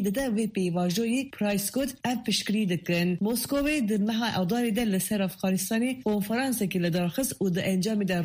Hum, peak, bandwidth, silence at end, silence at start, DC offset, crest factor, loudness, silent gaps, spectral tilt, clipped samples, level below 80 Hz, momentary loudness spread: none; -14 dBFS; 15.5 kHz; 0 s; 0 s; under 0.1%; 12 dB; -27 LUFS; none; -5 dB/octave; under 0.1%; -56 dBFS; 2 LU